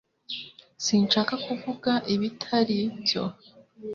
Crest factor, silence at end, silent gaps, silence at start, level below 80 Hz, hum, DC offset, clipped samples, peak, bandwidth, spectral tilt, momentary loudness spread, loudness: 18 dB; 0 s; none; 0.3 s; -66 dBFS; none; under 0.1%; under 0.1%; -10 dBFS; 7.4 kHz; -4 dB/octave; 13 LU; -26 LUFS